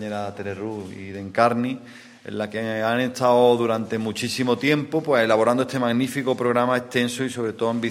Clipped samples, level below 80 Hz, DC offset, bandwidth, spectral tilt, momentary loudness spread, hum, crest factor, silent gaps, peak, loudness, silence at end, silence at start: under 0.1%; -66 dBFS; under 0.1%; 16 kHz; -5.5 dB/octave; 13 LU; none; 20 dB; none; -2 dBFS; -22 LUFS; 0 s; 0 s